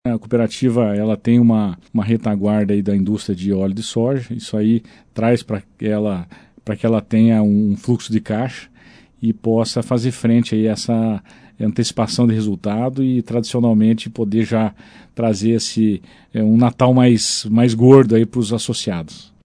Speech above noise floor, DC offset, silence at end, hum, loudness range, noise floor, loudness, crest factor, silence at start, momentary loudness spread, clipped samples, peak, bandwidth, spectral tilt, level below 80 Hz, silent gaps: 31 dB; under 0.1%; 0.2 s; none; 5 LU; -47 dBFS; -17 LUFS; 16 dB; 0.05 s; 10 LU; under 0.1%; 0 dBFS; 10.5 kHz; -6.5 dB/octave; -52 dBFS; none